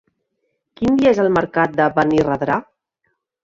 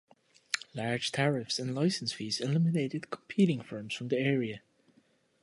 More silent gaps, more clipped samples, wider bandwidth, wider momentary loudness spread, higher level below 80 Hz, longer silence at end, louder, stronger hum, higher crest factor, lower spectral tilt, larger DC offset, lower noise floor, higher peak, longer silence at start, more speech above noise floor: neither; neither; second, 7.6 kHz vs 11.5 kHz; about the same, 7 LU vs 9 LU; first, -50 dBFS vs -74 dBFS; about the same, 0.8 s vs 0.85 s; first, -17 LUFS vs -32 LUFS; neither; second, 16 dB vs 22 dB; first, -7 dB/octave vs -5.5 dB/octave; neither; first, -72 dBFS vs -68 dBFS; first, -2 dBFS vs -10 dBFS; first, 0.8 s vs 0.5 s; first, 56 dB vs 37 dB